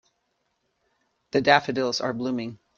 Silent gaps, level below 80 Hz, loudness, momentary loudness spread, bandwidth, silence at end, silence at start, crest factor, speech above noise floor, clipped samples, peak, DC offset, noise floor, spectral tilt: none; -66 dBFS; -24 LUFS; 10 LU; 7.6 kHz; 0.25 s; 1.35 s; 24 dB; 51 dB; under 0.1%; -2 dBFS; under 0.1%; -74 dBFS; -4.5 dB/octave